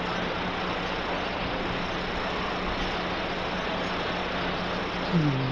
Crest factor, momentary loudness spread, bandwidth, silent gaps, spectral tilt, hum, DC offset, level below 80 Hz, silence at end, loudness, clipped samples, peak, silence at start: 16 dB; 3 LU; 11 kHz; none; -6 dB/octave; none; under 0.1%; -42 dBFS; 0 s; -29 LUFS; under 0.1%; -12 dBFS; 0 s